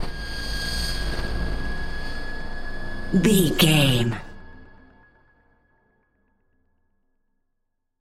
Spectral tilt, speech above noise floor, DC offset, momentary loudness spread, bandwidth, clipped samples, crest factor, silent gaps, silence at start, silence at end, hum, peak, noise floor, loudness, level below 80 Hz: -4.5 dB/octave; 56 dB; under 0.1%; 17 LU; 16 kHz; under 0.1%; 22 dB; none; 0 s; 3.35 s; none; -4 dBFS; -74 dBFS; -24 LUFS; -32 dBFS